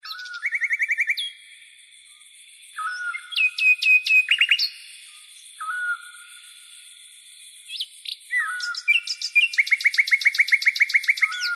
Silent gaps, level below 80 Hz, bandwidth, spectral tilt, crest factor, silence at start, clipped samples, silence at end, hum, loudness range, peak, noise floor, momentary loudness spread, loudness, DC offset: none; -82 dBFS; 14 kHz; 7.5 dB/octave; 16 dB; 0.05 s; under 0.1%; 0 s; none; 12 LU; -8 dBFS; -50 dBFS; 16 LU; -19 LUFS; under 0.1%